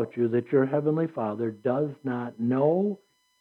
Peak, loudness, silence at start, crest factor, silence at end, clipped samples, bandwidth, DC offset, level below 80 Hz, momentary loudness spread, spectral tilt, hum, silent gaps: -10 dBFS; -27 LUFS; 0 s; 16 dB; 0.45 s; under 0.1%; 5.2 kHz; under 0.1%; -84 dBFS; 7 LU; -10.5 dB/octave; none; none